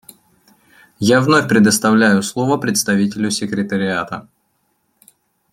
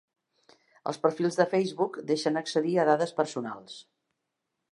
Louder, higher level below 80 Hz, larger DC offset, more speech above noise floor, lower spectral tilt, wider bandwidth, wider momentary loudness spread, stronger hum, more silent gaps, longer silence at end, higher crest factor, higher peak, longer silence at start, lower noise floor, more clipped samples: first, -15 LUFS vs -28 LUFS; first, -58 dBFS vs -82 dBFS; neither; second, 50 dB vs 56 dB; about the same, -4.5 dB/octave vs -5.5 dB/octave; first, 15.5 kHz vs 11.5 kHz; second, 8 LU vs 14 LU; neither; neither; first, 1.3 s vs 0.9 s; second, 16 dB vs 22 dB; first, -2 dBFS vs -8 dBFS; first, 1 s vs 0.85 s; second, -65 dBFS vs -83 dBFS; neither